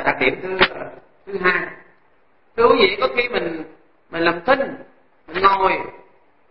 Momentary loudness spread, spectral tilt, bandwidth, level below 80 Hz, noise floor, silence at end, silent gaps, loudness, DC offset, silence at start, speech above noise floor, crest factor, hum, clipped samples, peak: 18 LU; -9 dB/octave; 5.8 kHz; -50 dBFS; -60 dBFS; 0.5 s; none; -18 LUFS; 0.7%; 0 s; 41 dB; 20 dB; none; under 0.1%; 0 dBFS